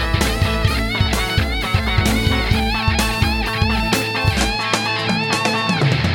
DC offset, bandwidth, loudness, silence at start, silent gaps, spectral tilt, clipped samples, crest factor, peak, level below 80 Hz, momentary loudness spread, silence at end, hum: under 0.1%; 17 kHz; -18 LUFS; 0 s; none; -4.5 dB/octave; under 0.1%; 16 dB; 0 dBFS; -24 dBFS; 2 LU; 0 s; none